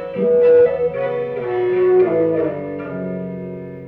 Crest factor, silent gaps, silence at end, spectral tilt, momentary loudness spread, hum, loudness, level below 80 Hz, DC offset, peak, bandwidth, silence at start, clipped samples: 12 dB; none; 0 s; -10.5 dB/octave; 14 LU; none; -17 LUFS; -54 dBFS; under 0.1%; -6 dBFS; 4.2 kHz; 0 s; under 0.1%